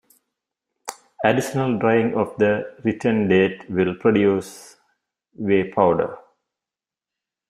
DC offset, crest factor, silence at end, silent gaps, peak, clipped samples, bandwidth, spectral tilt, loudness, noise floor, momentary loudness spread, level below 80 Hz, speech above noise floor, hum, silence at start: under 0.1%; 20 dB; 1.3 s; none; -2 dBFS; under 0.1%; 15.5 kHz; -6.5 dB/octave; -20 LUFS; -89 dBFS; 13 LU; -60 dBFS; 69 dB; none; 0.85 s